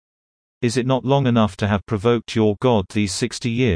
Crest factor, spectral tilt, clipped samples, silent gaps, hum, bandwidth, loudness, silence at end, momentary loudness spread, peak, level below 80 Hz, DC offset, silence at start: 16 dB; -6 dB/octave; under 0.1%; none; none; 10.5 kHz; -20 LUFS; 0 s; 5 LU; -4 dBFS; -50 dBFS; under 0.1%; 0.6 s